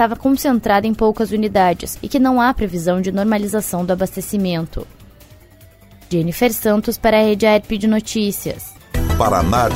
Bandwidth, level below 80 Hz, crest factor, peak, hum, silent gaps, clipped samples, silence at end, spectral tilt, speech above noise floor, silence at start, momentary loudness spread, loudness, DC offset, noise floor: 16.5 kHz; -32 dBFS; 16 dB; 0 dBFS; none; none; under 0.1%; 0 s; -5.5 dB/octave; 29 dB; 0 s; 10 LU; -17 LUFS; under 0.1%; -45 dBFS